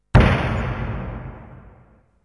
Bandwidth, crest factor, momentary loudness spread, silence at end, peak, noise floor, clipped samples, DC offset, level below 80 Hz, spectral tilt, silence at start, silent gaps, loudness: 11 kHz; 18 dB; 21 LU; 0.7 s; -2 dBFS; -53 dBFS; under 0.1%; under 0.1%; -28 dBFS; -7.5 dB/octave; 0.15 s; none; -21 LUFS